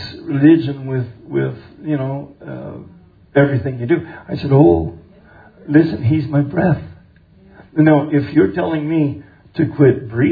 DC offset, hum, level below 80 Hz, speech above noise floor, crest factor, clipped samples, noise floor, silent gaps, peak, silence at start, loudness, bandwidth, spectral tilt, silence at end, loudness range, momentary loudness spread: under 0.1%; none; -44 dBFS; 32 dB; 16 dB; under 0.1%; -47 dBFS; none; 0 dBFS; 0 s; -16 LUFS; 5 kHz; -11 dB/octave; 0 s; 4 LU; 17 LU